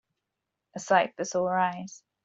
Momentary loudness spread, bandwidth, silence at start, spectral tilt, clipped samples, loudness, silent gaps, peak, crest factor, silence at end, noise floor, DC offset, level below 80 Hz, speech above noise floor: 18 LU; 8 kHz; 0.75 s; -4 dB/octave; under 0.1%; -27 LUFS; none; -8 dBFS; 22 dB; 0.3 s; -85 dBFS; under 0.1%; -74 dBFS; 58 dB